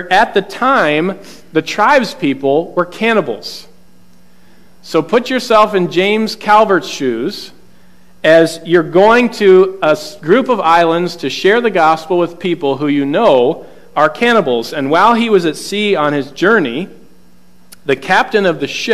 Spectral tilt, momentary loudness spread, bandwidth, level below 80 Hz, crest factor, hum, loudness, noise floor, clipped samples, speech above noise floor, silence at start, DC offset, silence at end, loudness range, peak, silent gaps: -5 dB/octave; 9 LU; 14.5 kHz; -52 dBFS; 14 dB; none; -12 LUFS; -48 dBFS; under 0.1%; 36 dB; 0 s; 1%; 0 s; 5 LU; 0 dBFS; none